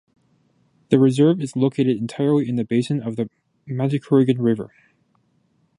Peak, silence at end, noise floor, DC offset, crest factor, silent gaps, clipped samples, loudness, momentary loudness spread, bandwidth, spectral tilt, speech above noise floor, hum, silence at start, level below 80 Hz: -2 dBFS; 1.1 s; -64 dBFS; under 0.1%; 18 dB; none; under 0.1%; -20 LUFS; 11 LU; 11 kHz; -8 dB/octave; 45 dB; none; 0.9 s; -64 dBFS